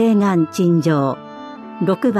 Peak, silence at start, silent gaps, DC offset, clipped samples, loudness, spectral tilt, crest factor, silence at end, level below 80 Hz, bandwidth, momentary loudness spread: -6 dBFS; 0 s; none; under 0.1%; under 0.1%; -17 LUFS; -7.5 dB/octave; 12 dB; 0 s; -66 dBFS; 13.5 kHz; 18 LU